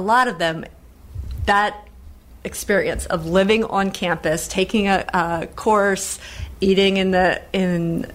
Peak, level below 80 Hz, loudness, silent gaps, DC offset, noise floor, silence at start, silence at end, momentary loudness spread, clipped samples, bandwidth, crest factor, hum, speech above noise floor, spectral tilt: -4 dBFS; -38 dBFS; -19 LUFS; none; under 0.1%; -42 dBFS; 0 s; 0 s; 15 LU; under 0.1%; 16 kHz; 16 dB; none; 23 dB; -4.5 dB/octave